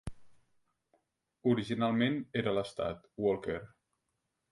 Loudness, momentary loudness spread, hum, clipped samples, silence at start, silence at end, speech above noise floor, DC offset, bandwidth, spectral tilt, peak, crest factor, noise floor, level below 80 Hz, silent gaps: -34 LUFS; 9 LU; none; under 0.1%; 0.05 s; 0.85 s; 51 dB; under 0.1%; 11.5 kHz; -7 dB/octave; -16 dBFS; 20 dB; -84 dBFS; -60 dBFS; none